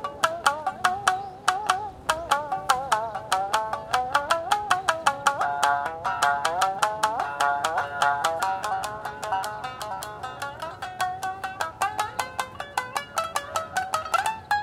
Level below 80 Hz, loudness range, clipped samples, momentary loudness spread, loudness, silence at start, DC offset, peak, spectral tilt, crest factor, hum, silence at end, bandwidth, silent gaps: -56 dBFS; 6 LU; under 0.1%; 9 LU; -26 LUFS; 0 s; under 0.1%; -2 dBFS; -1.5 dB/octave; 24 dB; none; 0 s; 17 kHz; none